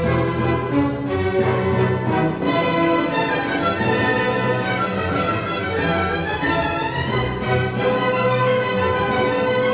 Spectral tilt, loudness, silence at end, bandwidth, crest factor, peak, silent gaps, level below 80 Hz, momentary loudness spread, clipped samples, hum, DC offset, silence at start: -10.5 dB/octave; -20 LUFS; 0 s; 4 kHz; 14 dB; -6 dBFS; none; -38 dBFS; 3 LU; under 0.1%; none; 0.1%; 0 s